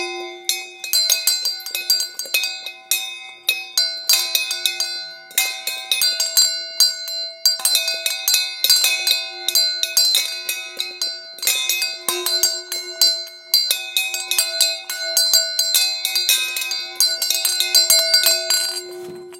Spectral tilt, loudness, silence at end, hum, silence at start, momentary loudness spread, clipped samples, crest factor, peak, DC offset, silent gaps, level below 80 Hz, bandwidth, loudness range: 3.5 dB/octave; -17 LUFS; 0 s; none; 0 s; 10 LU; under 0.1%; 20 dB; 0 dBFS; under 0.1%; none; -78 dBFS; 17 kHz; 4 LU